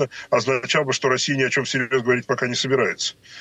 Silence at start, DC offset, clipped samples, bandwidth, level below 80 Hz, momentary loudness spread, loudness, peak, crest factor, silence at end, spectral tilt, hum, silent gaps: 0 s; under 0.1%; under 0.1%; 9 kHz; -66 dBFS; 3 LU; -21 LUFS; -6 dBFS; 16 dB; 0 s; -3.5 dB/octave; none; none